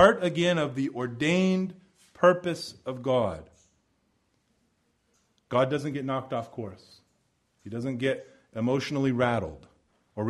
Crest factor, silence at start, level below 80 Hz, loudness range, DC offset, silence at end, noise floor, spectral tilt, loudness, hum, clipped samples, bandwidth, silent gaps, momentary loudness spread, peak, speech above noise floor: 24 dB; 0 s; -60 dBFS; 6 LU; under 0.1%; 0 s; -72 dBFS; -6 dB/octave; -28 LUFS; none; under 0.1%; 12 kHz; none; 16 LU; -4 dBFS; 44 dB